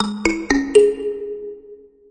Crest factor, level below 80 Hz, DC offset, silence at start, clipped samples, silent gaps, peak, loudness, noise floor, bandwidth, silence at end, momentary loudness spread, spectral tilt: 18 dB; -42 dBFS; under 0.1%; 0 s; under 0.1%; none; -2 dBFS; -18 LUFS; -44 dBFS; 10 kHz; 0.35 s; 17 LU; -4 dB/octave